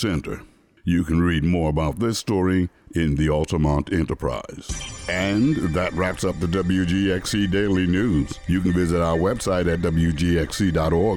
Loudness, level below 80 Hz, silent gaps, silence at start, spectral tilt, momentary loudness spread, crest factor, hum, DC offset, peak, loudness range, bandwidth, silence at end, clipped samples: -22 LUFS; -34 dBFS; none; 0 s; -6 dB/octave; 7 LU; 12 dB; none; under 0.1%; -10 dBFS; 2 LU; 18.5 kHz; 0 s; under 0.1%